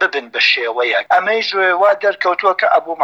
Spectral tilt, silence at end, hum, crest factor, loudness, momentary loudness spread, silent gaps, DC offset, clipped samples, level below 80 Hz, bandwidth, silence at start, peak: -2 dB/octave; 0 s; none; 14 dB; -14 LUFS; 3 LU; none; under 0.1%; under 0.1%; -74 dBFS; 8 kHz; 0 s; -2 dBFS